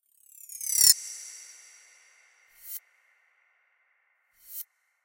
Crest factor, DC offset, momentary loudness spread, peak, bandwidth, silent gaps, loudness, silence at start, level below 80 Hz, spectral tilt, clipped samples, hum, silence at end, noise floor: 32 dB; under 0.1%; 28 LU; -2 dBFS; 17 kHz; none; -21 LUFS; 0.5 s; -70 dBFS; 4 dB/octave; under 0.1%; none; 0.4 s; -71 dBFS